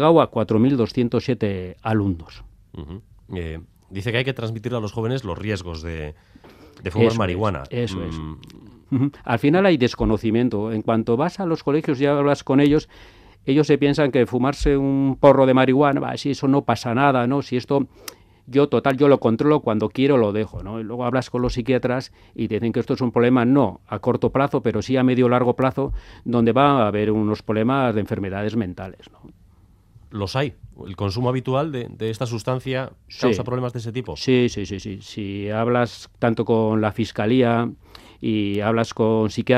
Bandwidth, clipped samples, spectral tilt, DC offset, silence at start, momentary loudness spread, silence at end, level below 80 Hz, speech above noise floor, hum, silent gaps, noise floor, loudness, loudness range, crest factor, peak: 14 kHz; under 0.1%; -7 dB/octave; under 0.1%; 0 s; 14 LU; 0 s; -44 dBFS; 33 dB; none; none; -53 dBFS; -21 LUFS; 9 LU; 20 dB; 0 dBFS